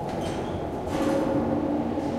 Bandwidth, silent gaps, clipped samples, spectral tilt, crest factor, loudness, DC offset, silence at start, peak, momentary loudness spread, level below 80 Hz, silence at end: 14 kHz; none; under 0.1%; -7 dB/octave; 14 dB; -27 LUFS; under 0.1%; 0 s; -14 dBFS; 6 LU; -46 dBFS; 0 s